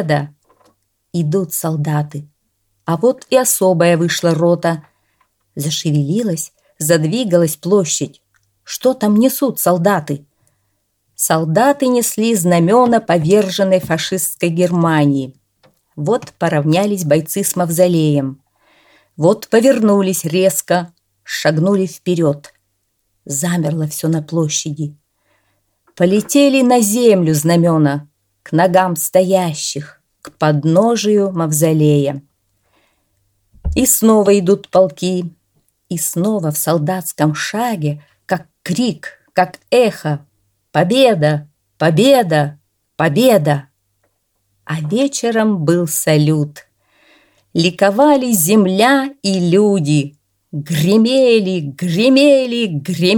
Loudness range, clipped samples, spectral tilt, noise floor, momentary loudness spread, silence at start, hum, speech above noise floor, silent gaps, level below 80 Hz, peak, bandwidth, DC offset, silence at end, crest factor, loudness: 5 LU; under 0.1%; -5 dB/octave; -67 dBFS; 11 LU; 0 s; none; 53 dB; none; -46 dBFS; 0 dBFS; 19 kHz; under 0.1%; 0 s; 14 dB; -14 LUFS